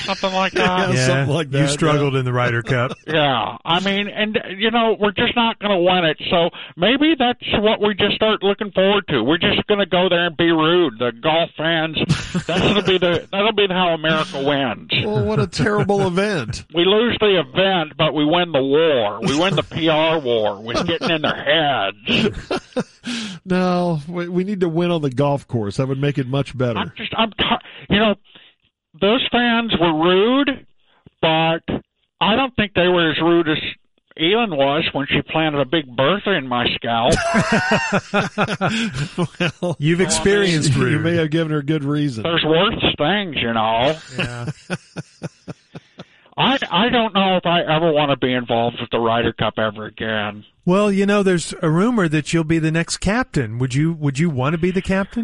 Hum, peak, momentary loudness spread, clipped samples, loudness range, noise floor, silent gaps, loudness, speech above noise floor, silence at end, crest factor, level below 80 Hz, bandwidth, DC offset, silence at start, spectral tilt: none; -4 dBFS; 6 LU; under 0.1%; 3 LU; -56 dBFS; none; -18 LUFS; 38 dB; 0 s; 14 dB; -44 dBFS; 11.5 kHz; under 0.1%; 0 s; -5 dB/octave